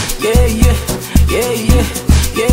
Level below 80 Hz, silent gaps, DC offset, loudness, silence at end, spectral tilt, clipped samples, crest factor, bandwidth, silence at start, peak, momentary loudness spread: -14 dBFS; none; under 0.1%; -13 LUFS; 0 s; -5 dB/octave; under 0.1%; 12 dB; 16.5 kHz; 0 s; 0 dBFS; 2 LU